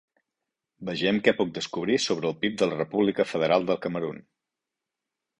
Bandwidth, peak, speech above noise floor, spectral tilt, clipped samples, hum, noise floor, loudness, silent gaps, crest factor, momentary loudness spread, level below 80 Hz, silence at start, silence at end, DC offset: 11 kHz; -4 dBFS; 61 dB; -5 dB/octave; under 0.1%; none; -87 dBFS; -26 LUFS; none; 22 dB; 10 LU; -66 dBFS; 0.8 s; 1.2 s; under 0.1%